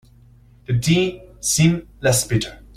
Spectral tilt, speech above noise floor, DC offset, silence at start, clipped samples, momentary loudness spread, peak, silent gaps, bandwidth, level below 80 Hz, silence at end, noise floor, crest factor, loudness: -4.5 dB/octave; 30 dB; under 0.1%; 0.7 s; under 0.1%; 8 LU; -4 dBFS; none; 16 kHz; -44 dBFS; 0.2 s; -49 dBFS; 16 dB; -19 LUFS